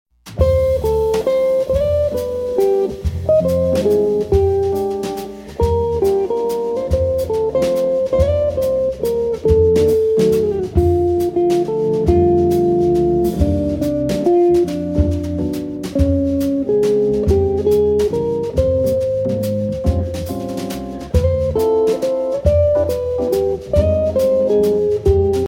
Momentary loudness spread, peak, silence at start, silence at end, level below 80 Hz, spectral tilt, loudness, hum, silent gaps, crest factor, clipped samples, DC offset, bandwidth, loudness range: 6 LU; 0 dBFS; 0.25 s; 0 s; -28 dBFS; -8 dB/octave; -17 LUFS; none; none; 14 dB; under 0.1%; under 0.1%; 17 kHz; 3 LU